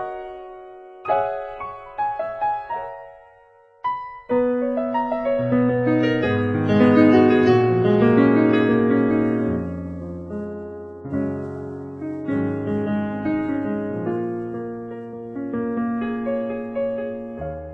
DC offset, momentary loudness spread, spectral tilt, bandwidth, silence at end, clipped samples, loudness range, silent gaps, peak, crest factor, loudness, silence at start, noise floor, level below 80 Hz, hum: under 0.1%; 17 LU; -9 dB/octave; 6.2 kHz; 0 s; under 0.1%; 11 LU; none; -4 dBFS; 18 dB; -21 LUFS; 0 s; -52 dBFS; -50 dBFS; none